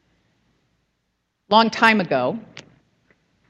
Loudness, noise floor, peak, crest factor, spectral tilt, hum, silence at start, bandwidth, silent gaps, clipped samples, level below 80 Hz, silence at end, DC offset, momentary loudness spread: -18 LUFS; -73 dBFS; 0 dBFS; 22 dB; -5 dB/octave; none; 1.5 s; 11.5 kHz; none; under 0.1%; -68 dBFS; 0.9 s; under 0.1%; 11 LU